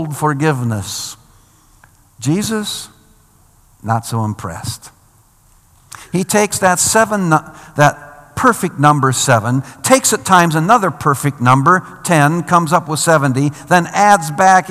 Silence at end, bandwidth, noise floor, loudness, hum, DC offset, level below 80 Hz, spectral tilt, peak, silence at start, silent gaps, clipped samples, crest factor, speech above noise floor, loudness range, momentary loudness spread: 0 s; 17 kHz; -50 dBFS; -14 LUFS; none; under 0.1%; -52 dBFS; -4.5 dB/octave; 0 dBFS; 0 s; none; 0.4%; 14 dB; 37 dB; 11 LU; 13 LU